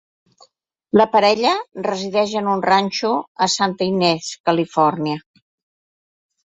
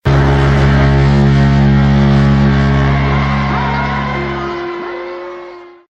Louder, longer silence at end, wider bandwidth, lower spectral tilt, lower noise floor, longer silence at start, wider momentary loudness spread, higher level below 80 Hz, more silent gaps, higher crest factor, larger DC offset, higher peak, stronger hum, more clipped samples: second, -18 LUFS vs -12 LUFS; first, 1.3 s vs 0.25 s; first, 8.4 kHz vs 7.2 kHz; second, -4.5 dB/octave vs -8 dB/octave; first, -56 dBFS vs -32 dBFS; first, 0.95 s vs 0.05 s; second, 8 LU vs 14 LU; second, -62 dBFS vs -20 dBFS; first, 3.28-3.35 s, 4.40-4.44 s vs none; first, 18 dB vs 12 dB; neither; about the same, -2 dBFS vs 0 dBFS; neither; neither